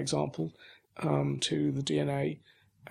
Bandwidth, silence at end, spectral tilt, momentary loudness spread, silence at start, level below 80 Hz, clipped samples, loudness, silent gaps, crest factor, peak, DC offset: 11 kHz; 0 s; -5.5 dB/octave; 9 LU; 0 s; -68 dBFS; under 0.1%; -32 LUFS; none; 18 dB; -14 dBFS; under 0.1%